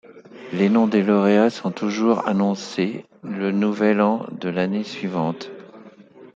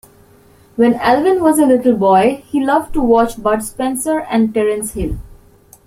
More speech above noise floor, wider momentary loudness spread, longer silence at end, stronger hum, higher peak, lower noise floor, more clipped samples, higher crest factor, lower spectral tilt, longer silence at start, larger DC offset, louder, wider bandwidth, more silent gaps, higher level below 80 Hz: second, 25 dB vs 33 dB; first, 15 LU vs 9 LU; second, 0.1 s vs 0.6 s; neither; second, -4 dBFS vs 0 dBFS; about the same, -45 dBFS vs -47 dBFS; neither; about the same, 18 dB vs 14 dB; first, -7 dB/octave vs -5 dB/octave; second, 0.05 s vs 0.75 s; neither; second, -21 LUFS vs -14 LUFS; second, 7.6 kHz vs 16 kHz; neither; second, -68 dBFS vs -36 dBFS